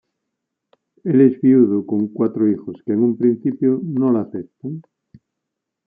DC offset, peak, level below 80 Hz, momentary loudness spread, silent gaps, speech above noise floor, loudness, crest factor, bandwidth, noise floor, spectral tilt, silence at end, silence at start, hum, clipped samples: under 0.1%; -2 dBFS; -68 dBFS; 16 LU; none; 63 dB; -17 LUFS; 16 dB; 2.7 kHz; -80 dBFS; -13.5 dB/octave; 1.05 s; 1.05 s; none; under 0.1%